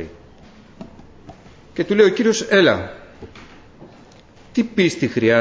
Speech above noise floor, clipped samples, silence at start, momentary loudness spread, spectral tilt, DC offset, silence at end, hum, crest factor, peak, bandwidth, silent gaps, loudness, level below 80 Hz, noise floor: 30 dB; under 0.1%; 0 s; 26 LU; -5 dB/octave; under 0.1%; 0 s; none; 20 dB; 0 dBFS; 8 kHz; none; -17 LUFS; -50 dBFS; -46 dBFS